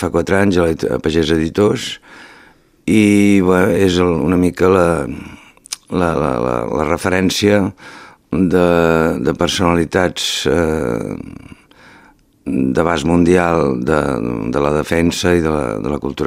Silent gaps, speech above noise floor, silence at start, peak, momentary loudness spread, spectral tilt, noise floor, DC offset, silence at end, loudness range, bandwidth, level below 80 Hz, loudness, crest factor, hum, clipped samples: none; 34 dB; 0 s; 0 dBFS; 11 LU; -5.5 dB/octave; -48 dBFS; under 0.1%; 0 s; 4 LU; 16 kHz; -36 dBFS; -15 LUFS; 16 dB; none; under 0.1%